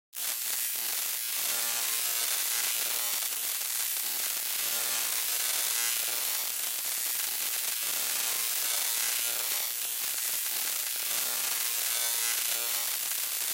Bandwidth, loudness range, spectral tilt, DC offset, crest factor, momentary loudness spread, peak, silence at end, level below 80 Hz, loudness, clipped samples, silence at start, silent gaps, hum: 16 kHz; 0 LU; 3.5 dB/octave; under 0.1%; 16 dB; 2 LU; -14 dBFS; 0 s; -78 dBFS; -28 LUFS; under 0.1%; 0.15 s; none; none